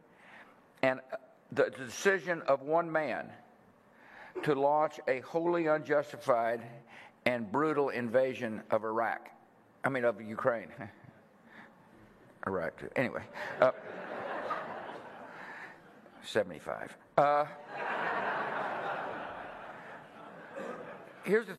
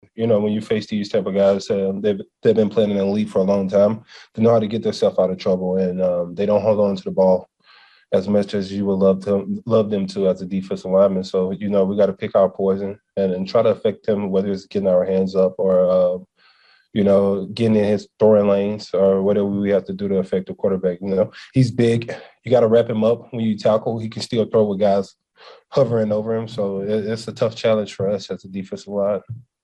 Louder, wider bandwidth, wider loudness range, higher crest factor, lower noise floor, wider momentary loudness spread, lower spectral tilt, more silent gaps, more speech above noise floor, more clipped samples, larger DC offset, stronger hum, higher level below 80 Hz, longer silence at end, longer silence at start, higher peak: second, -33 LUFS vs -19 LUFS; first, 13.5 kHz vs 10 kHz; first, 6 LU vs 3 LU; first, 24 dB vs 16 dB; first, -62 dBFS vs -55 dBFS; first, 18 LU vs 7 LU; second, -5.5 dB/octave vs -7.5 dB/octave; neither; second, 30 dB vs 37 dB; neither; neither; neither; second, -76 dBFS vs -60 dBFS; second, 0 s vs 0.2 s; about the same, 0.25 s vs 0.15 s; second, -10 dBFS vs -2 dBFS